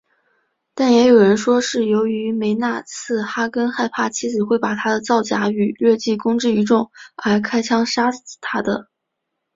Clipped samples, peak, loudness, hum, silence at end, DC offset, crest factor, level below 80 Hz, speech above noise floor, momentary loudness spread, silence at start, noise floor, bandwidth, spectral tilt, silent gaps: under 0.1%; -2 dBFS; -18 LUFS; none; 0.7 s; under 0.1%; 16 dB; -60 dBFS; 60 dB; 10 LU; 0.75 s; -77 dBFS; 7.8 kHz; -4.5 dB/octave; none